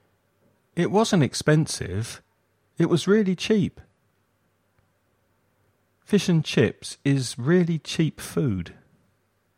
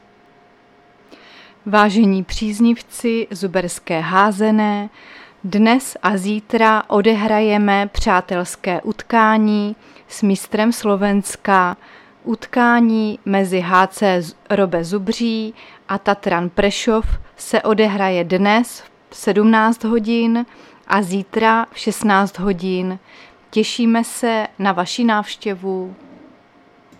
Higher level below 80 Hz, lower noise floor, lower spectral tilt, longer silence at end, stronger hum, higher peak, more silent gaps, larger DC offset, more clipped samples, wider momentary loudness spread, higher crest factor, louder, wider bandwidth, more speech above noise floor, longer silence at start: second, -58 dBFS vs -38 dBFS; first, -69 dBFS vs -50 dBFS; about the same, -6 dB/octave vs -5 dB/octave; second, 0.85 s vs 1.05 s; neither; second, -6 dBFS vs 0 dBFS; neither; neither; neither; about the same, 10 LU vs 10 LU; about the same, 18 dB vs 18 dB; second, -24 LUFS vs -17 LUFS; about the same, 15.5 kHz vs 14.5 kHz; first, 46 dB vs 34 dB; second, 0.75 s vs 1.65 s